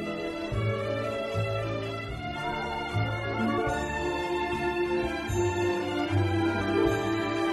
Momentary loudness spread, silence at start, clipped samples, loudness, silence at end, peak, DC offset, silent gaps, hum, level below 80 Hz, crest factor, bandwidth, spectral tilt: 6 LU; 0 s; under 0.1%; -29 LUFS; 0 s; -12 dBFS; under 0.1%; none; none; -46 dBFS; 16 dB; 13 kHz; -6 dB/octave